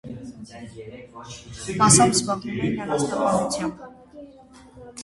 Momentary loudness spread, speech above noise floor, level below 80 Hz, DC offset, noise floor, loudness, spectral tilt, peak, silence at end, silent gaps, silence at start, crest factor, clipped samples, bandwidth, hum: 25 LU; 25 dB; -52 dBFS; under 0.1%; -48 dBFS; -21 LUFS; -4 dB/octave; -2 dBFS; 0 s; none; 0.05 s; 22 dB; under 0.1%; 11.5 kHz; none